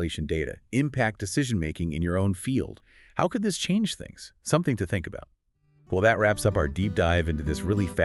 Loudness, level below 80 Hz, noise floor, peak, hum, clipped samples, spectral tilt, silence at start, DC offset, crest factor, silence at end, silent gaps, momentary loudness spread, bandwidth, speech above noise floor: -27 LUFS; -44 dBFS; -64 dBFS; -8 dBFS; none; under 0.1%; -5.5 dB/octave; 0 s; under 0.1%; 20 dB; 0 s; none; 9 LU; 12 kHz; 38 dB